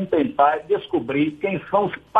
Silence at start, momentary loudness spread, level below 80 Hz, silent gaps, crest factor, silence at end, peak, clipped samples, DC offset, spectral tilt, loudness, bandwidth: 0 s; 5 LU; -58 dBFS; none; 16 dB; 0 s; -4 dBFS; under 0.1%; under 0.1%; -8.5 dB/octave; -21 LUFS; 4.8 kHz